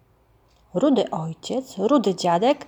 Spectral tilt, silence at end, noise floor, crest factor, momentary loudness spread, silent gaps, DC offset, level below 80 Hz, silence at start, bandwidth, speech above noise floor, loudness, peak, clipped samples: -6 dB/octave; 0.05 s; -59 dBFS; 16 dB; 9 LU; none; under 0.1%; -64 dBFS; 0.75 s; over 20 kHz; 38 dB; -22 LUFS; -6 dBFS; under 0.1%